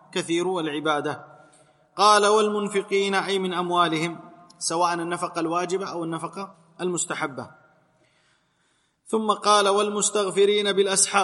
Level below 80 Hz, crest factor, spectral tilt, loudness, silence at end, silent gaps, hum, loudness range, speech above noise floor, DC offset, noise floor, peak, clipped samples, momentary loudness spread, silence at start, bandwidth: -78 dBFS; 20 dB; -3 dB/octave; -23 LUFS; 0 s; none; none; 8 LU; 45 dB; under 0.1%; -68 dBFS; -4 dBFS; under 0.1%; 13 LU; 0.15 s; 12 kHz